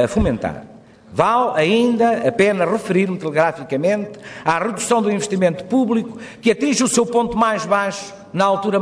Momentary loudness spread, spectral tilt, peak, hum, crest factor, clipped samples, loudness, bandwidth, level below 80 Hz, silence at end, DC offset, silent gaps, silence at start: 8 LU; -5 dB/octave; -2 dBFS; none; 16 dB; under 0.1%; -18 LUFS; 11 kHz; -42 dBFS; 0 s; under 0.1%; none; 0 s